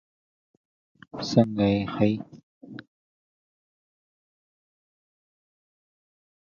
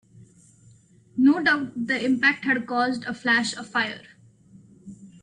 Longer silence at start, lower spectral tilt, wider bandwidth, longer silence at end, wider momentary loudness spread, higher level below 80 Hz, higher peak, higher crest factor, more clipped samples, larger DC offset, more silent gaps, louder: first, 1.15 s vs 0.15 s; first, -7 dB/octave vs -4 dB/octave; second, 7.2 kHz vs 10 kHz; first, 3.7 s vs 0.15 s; first, 22 LU vs 8 LU; first, -60 dBFS vs -68 dBFS; about the same, -6 dBFS vs -8 dBFS; first, 26 dB vs 18 dB; neither; neither; first, 2.43-2.61 s vs none; about the same, -25 LUFS vs -23 LUFS